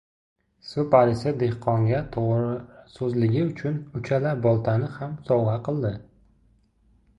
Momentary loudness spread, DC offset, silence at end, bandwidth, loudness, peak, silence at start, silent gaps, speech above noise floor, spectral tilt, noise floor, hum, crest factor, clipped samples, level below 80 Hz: 11 LU; under 0.1%; 1.15 s; 8.6 kHz; -24 LUFS; -4 dBFS; 0.65 s; none; 38 dB; -9 dB/octave; -62 dBFS; none; 20 dB; under 0.1%; -52 dBFS